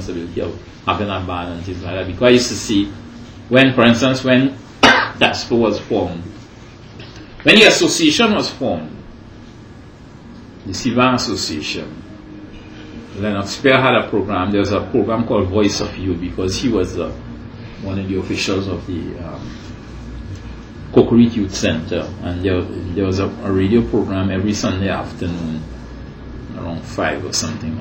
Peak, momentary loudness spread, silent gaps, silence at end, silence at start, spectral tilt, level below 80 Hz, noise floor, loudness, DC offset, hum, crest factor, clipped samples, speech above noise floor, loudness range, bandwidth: 0 dBFS; 21 LU; none; 0 s; 0 s; -4.5 dB/octave; -40 dBFS; -38 dBFS; -16 LUFS; under 0.1%; none; 18 dB; under 0.1%; 22 dB; 8 LU; 16.5 kHz